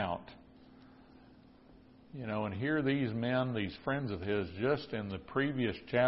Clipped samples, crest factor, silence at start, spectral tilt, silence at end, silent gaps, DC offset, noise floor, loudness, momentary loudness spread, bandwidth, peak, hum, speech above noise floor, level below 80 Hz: under 0.1%; 18 dB; 0 s; -5 dB/octave; 0 s; none; under 0.1%; -59 dBFS; -35 LUFS; 7 LU; 5.6 kHz; -16 dBFS; none; 25 dB; -60 dBFS